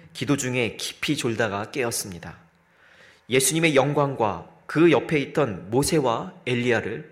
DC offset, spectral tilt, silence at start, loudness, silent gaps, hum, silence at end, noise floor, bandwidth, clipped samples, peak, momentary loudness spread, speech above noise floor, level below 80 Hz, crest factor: under 0.1%; -4.5 dB/octave; 0.05 s; -23 LUFS; none; none; 0.05 s; -57 dBFS; 16 kHz; under 0.1%; -6 dBFS; 10 LU; 34 dB; -56 dBFS; 18 dB